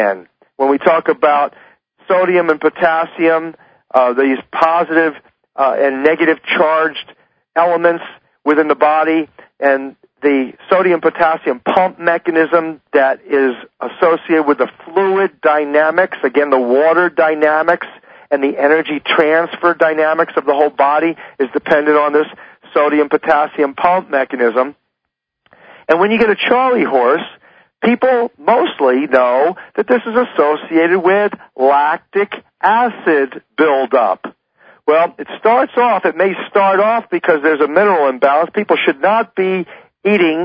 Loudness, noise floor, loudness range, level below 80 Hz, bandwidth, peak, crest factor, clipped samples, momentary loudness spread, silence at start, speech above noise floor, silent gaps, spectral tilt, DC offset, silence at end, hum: -14 LUFS; -76 dBFS; 2 LU; -62 dBFS; 5.2 kHz; 0 dBFS; 14 dB; under 0.1%; 7 LU; 0 s; 63 dB; none; -7.5 dB/octave; under 0.1%; 0 s; none